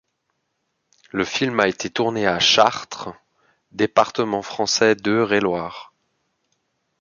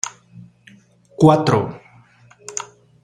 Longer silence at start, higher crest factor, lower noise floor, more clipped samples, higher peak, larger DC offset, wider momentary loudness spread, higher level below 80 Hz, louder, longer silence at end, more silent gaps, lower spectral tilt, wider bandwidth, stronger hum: first, 1.15 s vs 0.05 s; about the same, 20 dB vs 20 dB; first, -74 dBFS vs -50 dBFS; neither; about the same, -2 dBFS vs -2 dBFS; neither; second, 17 LU vs 25 LU; about the same, -58 dBFS vs -56 dBFS; about the same, -19 LUFS vs -18 LUFS; first, 1.15 s vs 0.4 s; neither; second, -3 dB/octave vs -6 dB/octave; second, 7.4 kHz vs 10.5 kHz; neither